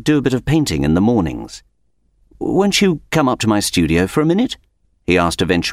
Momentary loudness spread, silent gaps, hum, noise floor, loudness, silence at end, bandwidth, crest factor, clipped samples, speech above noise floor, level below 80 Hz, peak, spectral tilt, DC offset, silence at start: 13 LU; none; none; -61 dBFS; -16 LUFS; 0 s; 16 kHz; 16 dB; under 0.1%; 45 dB; -36 dBFS; 0 dBFS; -5 dB/octave; under 0.1%; 0 s